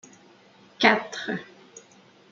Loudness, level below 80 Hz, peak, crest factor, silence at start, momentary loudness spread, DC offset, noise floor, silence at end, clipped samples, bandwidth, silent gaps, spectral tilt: -24 LUFS; -74 dBFS; -2 dBFS; 26 dB; 0.8 s; 16 LU; under 0.1%; -55 dBFS; 0.55 s; under 0.1%; 7.6 kHz; none; -3.5 dB/octave